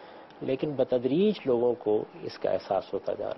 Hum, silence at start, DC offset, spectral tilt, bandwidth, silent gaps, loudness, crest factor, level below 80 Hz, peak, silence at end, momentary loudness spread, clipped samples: none; 0 s; under 0.1%; -8.5 dB/octave; 6 kHz; none; -28 LUFS; 14 dB; -64 dBFS; -14 dBFS; 0 s; 9 LU; under 0.1%